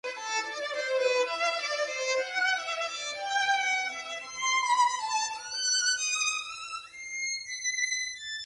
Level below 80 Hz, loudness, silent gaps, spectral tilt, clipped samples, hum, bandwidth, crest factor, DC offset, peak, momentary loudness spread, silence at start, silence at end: -74 dBFS; -29 LUFS; none; 2.5 dB/octave; under 0.1%; none; 11.5 kHz; 16 dB; under 0.1%; -14 dBFS; 8 LU; 0.05 s; 0 s